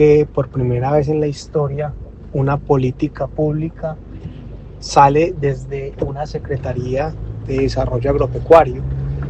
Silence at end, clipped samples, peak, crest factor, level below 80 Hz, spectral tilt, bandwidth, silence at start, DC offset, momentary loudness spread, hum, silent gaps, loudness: 0 s; 0.1%; 0 dBFS; 16 dB; -32 dBFS; -7.5 dB/octave; 8.6 kHz; 0 s; under 0.1%; 16 LU; none; none; -17 LUFS